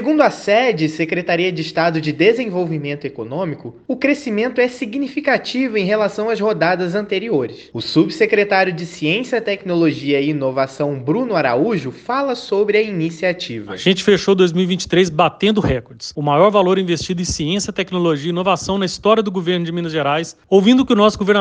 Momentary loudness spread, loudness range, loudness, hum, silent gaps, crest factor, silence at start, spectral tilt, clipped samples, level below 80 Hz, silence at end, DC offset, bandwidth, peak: 8 LU; 3 LU; -17 LUFS; none; none; 16 dB; 0 s; -5.5 dB/octave; under 0.1%; -46 dBFS; 0 s; under 0.1%; 9.6 kHz; 0 dBFS